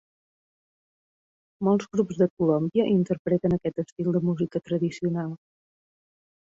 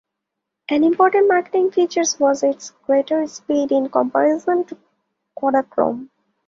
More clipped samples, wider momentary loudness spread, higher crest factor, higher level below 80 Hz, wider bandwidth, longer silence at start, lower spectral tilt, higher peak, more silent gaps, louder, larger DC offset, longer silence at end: neither; about the same, 6 LU vs 8 LU; about the same, 16 dB vs 16 dB; first, -60 dBFS vs -66 dBFS; about the same, 7.8 kHz vs 7.8 kHz; first, 1.6 s vs 0.7 s; first, -8.5 dB/octave vs -3 dB/octave; second, -10 dBFS vs -2 dBFS; first, 2.30-2.37 s, 3.19-3.25 s, 3.92-3.96 s vs none; second, -26 LUFS vs -18 LUFS; neither; first, 1.1 s vs 0.4 s